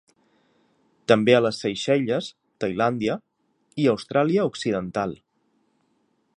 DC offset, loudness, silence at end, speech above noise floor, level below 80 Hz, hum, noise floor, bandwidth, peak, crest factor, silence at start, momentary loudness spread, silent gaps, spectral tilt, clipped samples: under 0.1%; -23 LUFS; 1.2 s; 47 dB; -62 dBFS; none; -69 dBFS; 11 kHz; -2 dBFS; 22 dB; 1.1 s; 14 LU; none; -6 dB/octave; under 0.1%